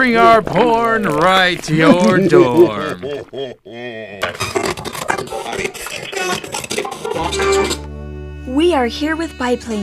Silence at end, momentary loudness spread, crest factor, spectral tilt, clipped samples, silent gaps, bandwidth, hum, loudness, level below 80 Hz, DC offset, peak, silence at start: 0 s; 17 LU; 16 dB; -4.5 dB/octave; under 0.1%; none; 15.5 kHz; none; -15 LUFS; -38 dBFS; under 0.1%; 0 dBFS; 0 s